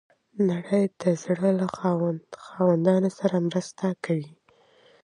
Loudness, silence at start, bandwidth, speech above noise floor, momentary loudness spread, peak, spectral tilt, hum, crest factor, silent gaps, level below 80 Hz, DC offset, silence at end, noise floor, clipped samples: -25 LUFS; 0.35 s; 10.5 kHz; 35 dB; 8 LU; -8 dBFS; -7.5 dB/octave; none; 18 dB; none; -70 dBFS; under 0.1%; 0.75 s; -59 dBFS; under 0.1%